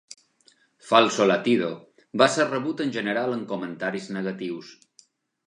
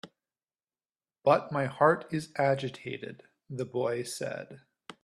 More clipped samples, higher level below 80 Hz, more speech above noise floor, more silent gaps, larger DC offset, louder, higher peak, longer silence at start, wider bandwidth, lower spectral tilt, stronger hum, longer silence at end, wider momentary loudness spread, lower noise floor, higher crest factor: neither; about the same, -76 dBFS vs -72 dBFS; second, 38 dB vs over 60 dB; neither; neither; first, -24 LUFS vs -30 LUFS; first, -2 dBFS vs -8 dBFS; first, 0.85 s vs 0.05 s; second, 11 kHz vs 14 kHz; about the same, -4.5 dB/octave vs -5.5 dB/octave; neither; first, 0.75 s vs 0.1 s; second, 14 LU vs 17 LU; second, -62 dBFS vs under -90 dBFS; about the same, 22 dB vs 22 dB